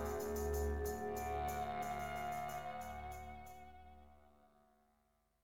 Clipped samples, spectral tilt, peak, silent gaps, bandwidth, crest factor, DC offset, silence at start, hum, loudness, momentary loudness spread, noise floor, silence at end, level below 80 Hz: under 0.1%; -5.5 dB/octave; -28 dBFS; none; 19 kHz; 16 dB; 0.1%; 0 s; none; -43 LUFS; 18 LU; -79 dBFS; 0 s; -52 dBFS